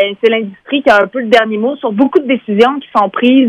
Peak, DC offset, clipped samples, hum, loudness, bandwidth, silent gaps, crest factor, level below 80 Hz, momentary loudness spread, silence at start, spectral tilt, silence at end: 0 dBFS; under 0.1%; 0.5%; none; -12 LUFS; 9.2 kHz; none; 12 dB; -54 dBFS; 6 LU; 0 s; -6 dB/octave; 0 s